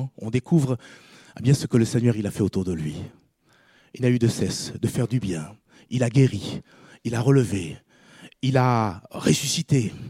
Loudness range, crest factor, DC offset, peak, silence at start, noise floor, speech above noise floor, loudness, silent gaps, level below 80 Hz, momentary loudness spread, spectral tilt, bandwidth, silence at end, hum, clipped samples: 3 LU; 18 dB; under 0.1%; -6 dBFS; 0 s; -60 dBFS; 38 dB; -23 LUFS; none; -54 dBFS; 12 LU; -6 dB/octave; 15 kHz; 0 s; none; under 0.1%